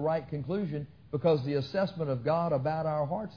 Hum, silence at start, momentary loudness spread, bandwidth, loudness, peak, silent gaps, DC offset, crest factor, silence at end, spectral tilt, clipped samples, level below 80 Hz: none; 0 s; 7 LU; 5.4 kHz; -31 LUFS; -16 dBFS; none; under 0.1%; 16 dB; 0 s; -9 dB/octave; under 0.1%; -60 dBFS